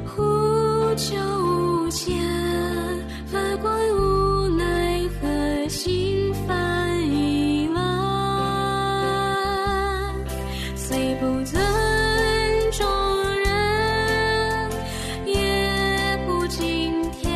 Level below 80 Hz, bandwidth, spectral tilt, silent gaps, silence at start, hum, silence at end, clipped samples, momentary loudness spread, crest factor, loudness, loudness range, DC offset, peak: -34 dBFS; 14 kHz; -5 dB/octave; none; 0 s; none; 0 s; under 0.1%; 6 LU; 14 dB; -23 LUFS; 2 LU; under 0.1%; -10 dBFS